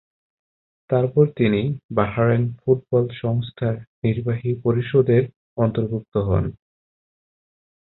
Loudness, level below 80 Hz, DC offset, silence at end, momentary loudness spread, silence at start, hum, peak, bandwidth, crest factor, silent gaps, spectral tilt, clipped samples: -21 LUFS; -44 dBFS; under 0.1%; 1.4 s; 7 LU; 0.9 s; none; -4 dBFS; 4.1 kHz; 18 dB; 1.84-1.89 s, 3.87-4.02 s, 5.36-5.56 s, 6.08-6.12 s; -13 dB/octave; under 0.1%